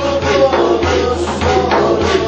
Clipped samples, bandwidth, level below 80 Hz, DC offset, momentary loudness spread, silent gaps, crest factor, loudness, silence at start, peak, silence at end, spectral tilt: under 0.1%; 9 kHz; -30 dBFS; under 0.1%; 3 LU; none; 12 dB; -13 LUFS; 0 s; 0 dBFS; 0 s; -5.5 dB/octave